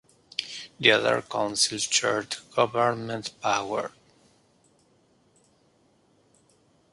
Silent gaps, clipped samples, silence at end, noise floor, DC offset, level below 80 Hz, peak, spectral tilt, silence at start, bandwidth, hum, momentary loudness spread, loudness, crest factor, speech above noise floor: none; under 0.1%; 3.05 s; -64 dBFS; under 0.1%; -70 dBFS; -2 dBFS; -2 dB/octave; 0.4 s; 11.5 kHz; none; 13 LU; -25 LUFS; 26 dB; 39 dB